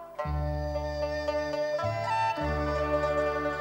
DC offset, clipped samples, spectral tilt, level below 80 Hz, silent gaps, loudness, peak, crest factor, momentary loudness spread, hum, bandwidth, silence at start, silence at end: under 0.1%; under 0.1%; -6.5 dB/octave; -40 dBFS; none; -30 LUFS; -16 dBFS; 14 dB; 4 LU; none; 16 kHz; 0 s; 0 s